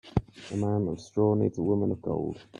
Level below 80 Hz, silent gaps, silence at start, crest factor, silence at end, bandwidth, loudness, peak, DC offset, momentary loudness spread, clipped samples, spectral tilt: -50 dBFS; none; 0.05 s; 18 dB; 0 s; 10 kHz; -29 LUFS; -10 dBFS; under 0.1%; 7 LU; under 0.1%; -8.5 dB/octave